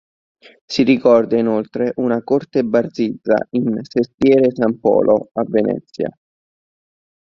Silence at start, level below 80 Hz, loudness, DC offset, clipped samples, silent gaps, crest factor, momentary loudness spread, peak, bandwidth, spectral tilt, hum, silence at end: 0.7 s; -56 dBFS; -17 LUFS; under 0.1%; under 0.1%; 4.14-4.18 s; 16 dB; 8 LU; -2 dBFS; 7.4 kHz; -7 dB/octave; none; 1.2 s